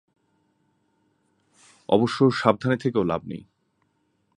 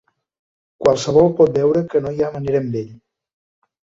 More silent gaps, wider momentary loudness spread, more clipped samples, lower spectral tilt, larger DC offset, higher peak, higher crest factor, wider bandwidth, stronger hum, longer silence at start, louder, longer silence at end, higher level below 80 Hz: neither; first, 19 LU vs 10 LU; neither; about the same, -7 dB/octave vs -7 dB/octave; neither; about the same, -2 dBFS vs -2 dBFS; first, 24 dB vs 18 dB; first, 11 kHz vs 7.8 kHz; neither; first, 1.9 s vs 0.8 s; second, -23 LUFS vs -17 LUFS; about the same, 1 s vs 1 s; second, -60 dBFS vs -52 dBFS